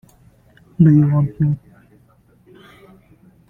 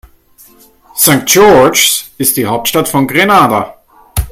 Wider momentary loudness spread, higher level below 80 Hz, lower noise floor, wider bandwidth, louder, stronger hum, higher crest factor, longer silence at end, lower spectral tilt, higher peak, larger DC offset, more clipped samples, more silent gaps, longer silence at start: about the same, 14 LU vs 14 LU; second, -52 dBFS vs -32 dBFS; first, -53 dBFS vs -43 dBFS; second, 3.3 kHz vs over 20 kHz; second, -16 LUFS vs -8 LUFS; neither; first, 18 dB vs 10 dB; first, 1.9 s vs 0 s; first, -11.5 dB/octave vs -3 dB/octave; about the same, -2 dBFS vs 0 dBFS; neither; second, under 0.1% vs 0.7%; neither; second, 0.8 s vs 0.95 s